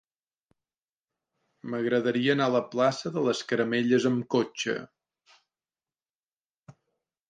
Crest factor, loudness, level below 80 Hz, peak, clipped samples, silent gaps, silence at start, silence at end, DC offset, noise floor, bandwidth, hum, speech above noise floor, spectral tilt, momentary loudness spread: 20 dB; -27 LUFS; -76 dBFS; -10 dBFS; under 0.1%; 6.15-6.23 s, 6.32-6.50 s, 6.57-6.62 s; 1.65 s; 0.6 s; under 0.1%; under -90 dBFS; 9.4 kHz; none; over 64 dB; -5.5 dB/octave; 8 LU